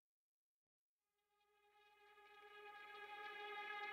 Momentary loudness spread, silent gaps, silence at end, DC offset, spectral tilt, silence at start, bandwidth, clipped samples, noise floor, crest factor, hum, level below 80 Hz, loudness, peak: 17 LU; none; 0 s; under 0.1%; -1 dB/octave; 1.55 s; 15.5 kHz; under 0.1%; under -90 dBFS; 18 dB; none; under -90 dBFS; -54 LUFS; -40 dBFS